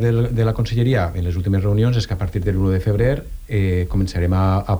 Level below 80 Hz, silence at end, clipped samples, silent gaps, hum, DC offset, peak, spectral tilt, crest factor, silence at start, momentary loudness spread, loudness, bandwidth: -30 dBFS; 0 s; under 0.1%; none; none; under 0.1%; -6 dBFS; -8 dB/octave; 12 dB; 0 s; 5 LU; -19 LUFS; over 20 kHz